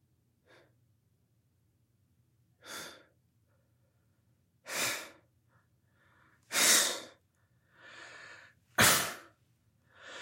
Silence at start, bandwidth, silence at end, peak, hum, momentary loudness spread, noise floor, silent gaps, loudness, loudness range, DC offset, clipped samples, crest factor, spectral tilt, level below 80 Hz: 2.65 s; 16.5 kHz; 0 s; -10 dBFS; none; 26 LU; -73 dBFS; none; -28 LUFS; 24 LU; under 0.1%; under 0.1%; 28 dB; -0.5 dB/octave; -70 dBFS